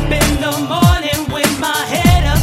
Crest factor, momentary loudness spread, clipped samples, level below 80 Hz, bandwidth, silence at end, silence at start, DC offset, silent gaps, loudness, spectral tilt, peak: 14 dB; 5 LU; under 0.1%; -20 dBFS; 16.5 kHz; 0 s; 0 s; under 0.1%; none; -14 LUFS; -4.5 dB/octave; 0 dBFS